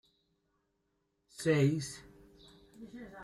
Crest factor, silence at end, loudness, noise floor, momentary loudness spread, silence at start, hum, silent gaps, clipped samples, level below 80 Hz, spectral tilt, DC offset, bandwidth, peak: 20 dB; 0 s; -32 LUFS; -80 dBFS; 24 LU; 1.4 s; none; none; under 0.1%; -68 dBFS; -6 dB/octave; under 0.1%; 12.5 kHz; -16 dBFS